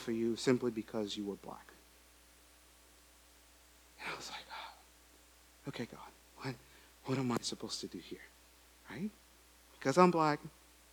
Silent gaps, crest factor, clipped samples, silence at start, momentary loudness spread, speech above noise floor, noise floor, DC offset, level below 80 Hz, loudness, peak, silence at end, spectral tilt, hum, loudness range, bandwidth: none; 28 dB; under 0.1%; 0 s; 21 LU; 27 dB; -63 dBFS; under 0.1%; -68 dBFS; -37 LUFS; -12 dBFS; 0.45 s; -5 dB/octave; none; 14 LU; over 20 kHz